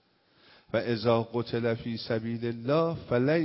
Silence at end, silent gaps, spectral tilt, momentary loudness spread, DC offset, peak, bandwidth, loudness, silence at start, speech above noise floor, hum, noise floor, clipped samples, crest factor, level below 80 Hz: 0 s; none; -10.5 dB/octave; 6 LU; under 0.1%; -10 dBFS; 5.8 kHz; -29 LUFS; 0.75 s; 35 dB; none; -63 dBFS; under 0.1%; 18 dB; -60 dBFS